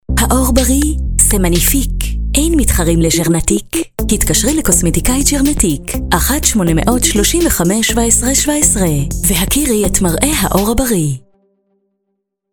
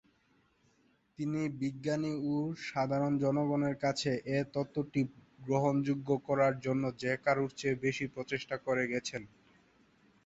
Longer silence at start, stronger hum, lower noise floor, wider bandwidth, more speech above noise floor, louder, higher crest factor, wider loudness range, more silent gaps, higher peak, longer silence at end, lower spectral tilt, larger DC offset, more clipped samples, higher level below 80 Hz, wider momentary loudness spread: second, 0.1 s vs 1.2 s; neither; about the same, -70 dBFS vs -71 dBFS; first, over 20 kHz vs 8.2 kHz; first, 58 dB vs 38 dB; first, -12 LUFS vs -34 LUFS; second, 12 dB vs 18 dB; about the same, 2 LU vs 3 LU; neither; first, 0 dBFS vs -16 dBFS; first, 1.35 s vs 1 s; second, -4 dB/octave vs -6 dB/octave; neither; neither; first, -20 dBFS vs -68 dBFS; about the same, 6 LU vs 7 LU